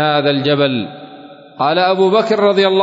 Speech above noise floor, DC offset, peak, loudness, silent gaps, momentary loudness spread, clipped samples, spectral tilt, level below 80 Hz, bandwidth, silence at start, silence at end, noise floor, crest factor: 24 dB; under 0.1%; -2 dBFS; -14 LUFS; none; 10 LU; under 0.1%; -6.5 dB/octave; -64 dBFS; 7.8 kHz; 0 s; 0 s; -37 dBFS; 12 dB